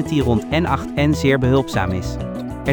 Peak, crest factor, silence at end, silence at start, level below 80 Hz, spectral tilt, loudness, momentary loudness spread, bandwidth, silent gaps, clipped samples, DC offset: -2 dBFS; 16 dB; 0 s; 0 s; -34 dBFS; -6.5 dB/octave; -19 LUFS; 10 LU; over 20 kHz; none; under 0.1%; under 0.1%